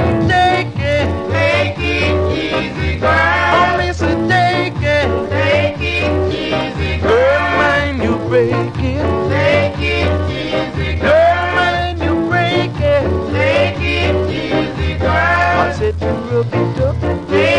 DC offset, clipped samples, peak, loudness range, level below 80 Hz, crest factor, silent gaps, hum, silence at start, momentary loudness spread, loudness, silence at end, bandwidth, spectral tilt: under 0.1%; under 0.1%; -2 dBFS; 1 LU; -26 dBFS; 12 dB; none; none; 0 s; 6 LU; -15 LUFS; 0 s; 10 kHz; -6.5 dB/octave